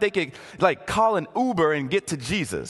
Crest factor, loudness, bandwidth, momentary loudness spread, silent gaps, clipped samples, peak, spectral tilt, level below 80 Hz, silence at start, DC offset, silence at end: 20 dB; -24 LUFS; 12.5 kHz; 5 LU; none; under 0.1%; -4 dBFS; -5 dB/octave; -50 dBFS; 0 s; under 0.1%; 0 s